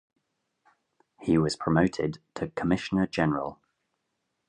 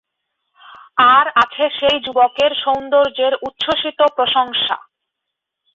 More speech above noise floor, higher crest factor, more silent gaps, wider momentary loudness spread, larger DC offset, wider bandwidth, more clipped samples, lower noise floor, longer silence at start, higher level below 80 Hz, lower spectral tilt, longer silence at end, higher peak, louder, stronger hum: second, 53 dB vs 64 dB; first, 22 dB vs 16 dB; neither; first, 11 LU vs 8 LU; neither; first, 10.5 kHz vs 7.6 kHz; neither; about the same, -80 dBFS vs -79 dBFS; first, 1.2 s vs 0.7 s; about the same, -54 dBFS vs -56 dBFS; first, -6.5 dB/octave vs -3.5 dB/octave; about the same, 0.95 s vs 0.95 s; second, -8 dBFS vs -2 dBFS; second, -28 LUFS vs -15 LUFS; neither